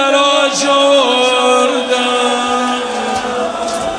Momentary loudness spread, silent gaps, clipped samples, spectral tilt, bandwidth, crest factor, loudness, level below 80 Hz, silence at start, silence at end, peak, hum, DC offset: 8 LU; none; under 0.1%; -1.5 dB/octave; 11 kHz; 12 dB; -12 LUFS; -50 dBFS; 0 s; 0 s; 0 dBFS; none; under 0.1%